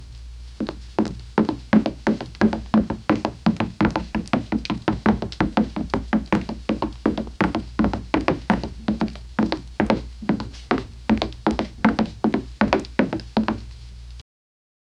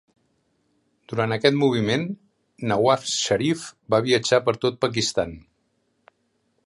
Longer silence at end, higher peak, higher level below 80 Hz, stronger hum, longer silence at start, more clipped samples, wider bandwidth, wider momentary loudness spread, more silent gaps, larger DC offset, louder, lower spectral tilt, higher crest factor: second, 0.8 s vs 1.25 s; about the same, 0 dBFS vs -2 dBFS; first, -38 dBFS vs -56 dBFS; neither; second, 0 s vs 1.1 s; neither; second, 9.4 kHz vs 11.5 kHz; second, 6 LU vs 12 LU; neither; neither; about the same, -24 LUFS vs -22 LUFS; first, -7 dB/octave vs -4.5 dB/octave; about the same, 24 dB vs 22 dB